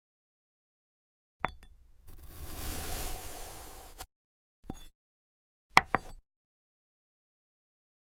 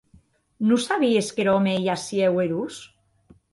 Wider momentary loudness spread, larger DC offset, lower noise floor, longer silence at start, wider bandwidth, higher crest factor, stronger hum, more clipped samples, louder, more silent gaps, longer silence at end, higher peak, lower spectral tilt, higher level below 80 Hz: first, 24 LU vs 8 LU; neither; about the same, -55 dBFS vs -58 dBFS; first, 1.45 s vs 0.6 s; first, 17 kHz vs 11.5 kHz; first, 36 dB vs 16 dB; neither; neither; second, -33 LUFS vs -22 LUFS; first, 4.16-4.63 s, 4.95-5.70 s vs none; first, 1.85 s vs 0.65 s; first, -4 dBFS vs -8 dBFS; second, -2.5 dB/octave vs -5.5 dB/octave; first, -48 dBFS vs -64 dBFS